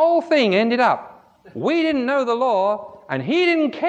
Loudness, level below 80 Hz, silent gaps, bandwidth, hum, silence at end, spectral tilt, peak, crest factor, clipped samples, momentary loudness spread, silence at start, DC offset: -19 LUFS; -66 dBFS; none; 8.4 kHz; none; 0 s; -6 dB/octave; -4 dBFS; 14 dB; under 0.1%; 10 LU; 0 s; under 0.1%